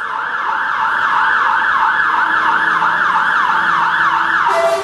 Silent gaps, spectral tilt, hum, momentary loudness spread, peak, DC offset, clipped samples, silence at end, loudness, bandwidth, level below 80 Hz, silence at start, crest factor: none; -2.5 dB/octave; none; 4 LU; -2 dBFS; under 0.1%; under 0.1%; 0 s; -13 LUFS; 13 kHz; -56 dBFS; 0 s; 14 dB